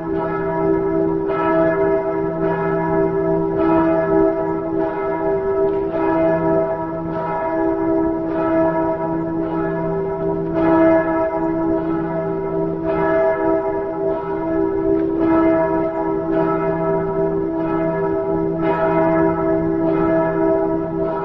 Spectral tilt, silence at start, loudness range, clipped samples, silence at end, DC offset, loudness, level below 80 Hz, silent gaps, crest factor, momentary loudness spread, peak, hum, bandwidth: -10.5 dB/octave; 0 s; 2 LU; under 0.1%; 0 s; 0.4%; -19 LUFS; -42 dBFS; none; 14 dB; 5 LU; -4 dBFS; none; 4.3 kHz